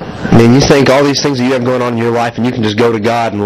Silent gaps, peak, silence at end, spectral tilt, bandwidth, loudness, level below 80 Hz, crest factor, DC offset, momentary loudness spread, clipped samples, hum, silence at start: none; 0 dBFS; 0 s; -5.5 dB/octave; 14.5 kHz; -10 LUFS; -34 dBFS; 10 dB; under 0.1%; 7 LU; 0.8%; none; 0 s